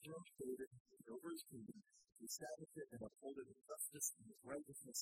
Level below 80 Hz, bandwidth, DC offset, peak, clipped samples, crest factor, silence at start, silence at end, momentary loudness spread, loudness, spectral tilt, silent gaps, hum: -84 dBFS; 16 kHz; under 0.1%; -28 dBFS; under 0.1%; 24 dB; 0 s; 0 s; 13 LU; -52 LUFS; -3 dB/octave; 0.67-0.71 s, 0.80-0.85 s; none